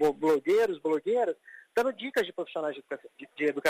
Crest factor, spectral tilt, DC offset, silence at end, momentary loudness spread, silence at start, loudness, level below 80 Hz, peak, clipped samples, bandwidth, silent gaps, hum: 16 dB; -4.5 dB/octave; under 0.1%; 0 s; 15 LU; 0 s; -29 LUFS; -70 dBFS; -14 dBFS; under 0.1%; 15.5 kHz; none; none